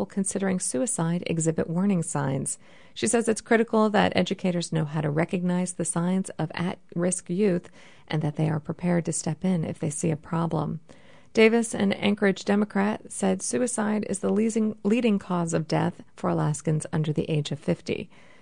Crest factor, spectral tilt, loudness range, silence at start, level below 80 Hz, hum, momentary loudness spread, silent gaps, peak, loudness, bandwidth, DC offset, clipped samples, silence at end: 20 dB; -5.5 dB/octave; 3 LU; 0 s; -62 dBFS; none; 7 LU; none; -6 dBFS; -26 LUFS; 10.5 kHz; 0.3%; under 0.1%; 0.35 s